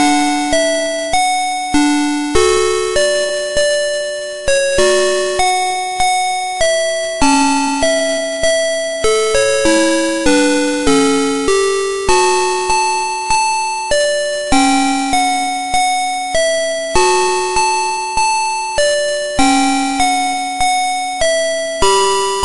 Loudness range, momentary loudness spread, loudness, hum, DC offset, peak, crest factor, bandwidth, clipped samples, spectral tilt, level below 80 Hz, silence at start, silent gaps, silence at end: 1 LU; 5 LU; -14 LUFS; none; under 0.1%; 0 dBFS; 14 dB; 11.5 kHz; under 0.1%; -2 dB/octave; -36 dBFS; 0 s; none; 0 s